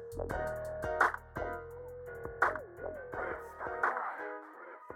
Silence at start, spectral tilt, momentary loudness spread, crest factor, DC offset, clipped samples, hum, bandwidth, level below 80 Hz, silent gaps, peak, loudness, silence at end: 0 s; -5.5 dB/octave; 15 LU; 24 dB; under 0.1%; under 0.1%; none; 17 kHz; -56 dBFS; none; -14 dBFS; -37 LUFS; 0 s